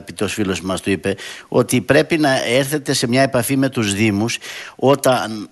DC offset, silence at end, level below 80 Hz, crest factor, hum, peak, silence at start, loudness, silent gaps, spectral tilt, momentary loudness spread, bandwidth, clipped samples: under 0.1%; 0.05 s; -52 dBFS; 18 dB; none; 0 dBFS; 0 s; -17 LUFS; none; -4.5 dB/octave; 7 LU; 12.5 kHz; under 0.1%